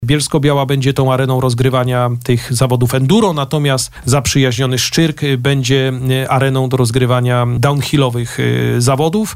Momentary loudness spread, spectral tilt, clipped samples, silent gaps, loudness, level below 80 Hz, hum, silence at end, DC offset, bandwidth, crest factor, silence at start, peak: 3 LU; -5.5 dB/octave; under 0.1%; none; -14 LUFS; -38 dBFS; none; 0 s; under 0.1%; 16 kHz; 12 dB; 0 s; -2 dBFS